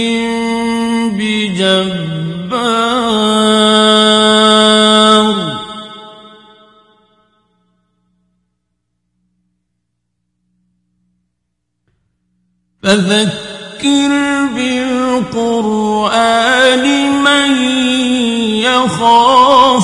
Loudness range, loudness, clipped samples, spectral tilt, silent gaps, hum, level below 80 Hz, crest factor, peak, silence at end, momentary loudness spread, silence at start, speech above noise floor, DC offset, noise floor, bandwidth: 9 LU; -11 LUFS; under 0.1%; -3.5 dB/octave; none; 60 Hz at -50 dBFS; -50 dBFS; 12 dB; 0 dBFS; 0 s; 11 LU; 0 s; 60 dB; under 0.1%; -71 dBFS; 11.5 kHz